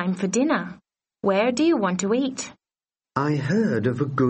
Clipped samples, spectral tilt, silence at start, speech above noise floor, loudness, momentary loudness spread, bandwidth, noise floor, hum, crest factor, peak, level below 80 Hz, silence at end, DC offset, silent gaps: under 0.1%; -5.5 dB/octave; 0 s; over 68 dB; -23 LUFS; 10 LU; 8.8 kHz; under -90 dBFS; none; 18 dB; -6 dBFS; -62 dBFS; 0 s; under 0.1%; none